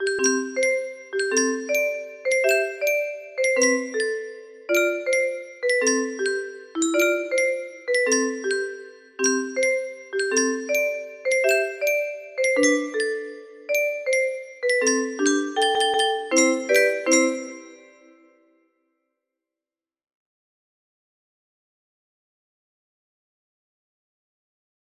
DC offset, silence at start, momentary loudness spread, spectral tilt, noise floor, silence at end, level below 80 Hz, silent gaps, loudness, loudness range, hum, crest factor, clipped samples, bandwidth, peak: under 0.1%; 0 s; 11 LU; 0 dB/octave; under -90 dBFS; 7.05 s; -74 dBFS; none; -22 LUFS; 3 LU; none; 20 dB; under 0.1%; 15 kHz; -4 dBFS